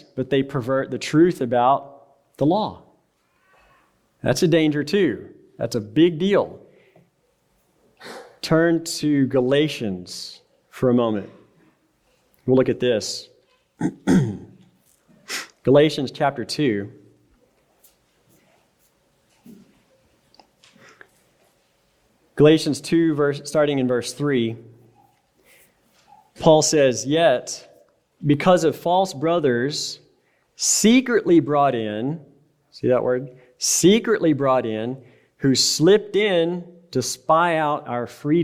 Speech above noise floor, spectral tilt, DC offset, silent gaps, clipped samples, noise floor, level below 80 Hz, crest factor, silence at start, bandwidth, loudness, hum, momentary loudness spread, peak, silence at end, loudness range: 46 dB; -4.5 dB/octave; under 0.1%; none; under 0.1%; -65 dBFS; -58 dBFS; 20 dB; 0.15 s; 16 kHz; -20 LUFS; none; 15 LU; -2 dBFS; 0 s; 5 LU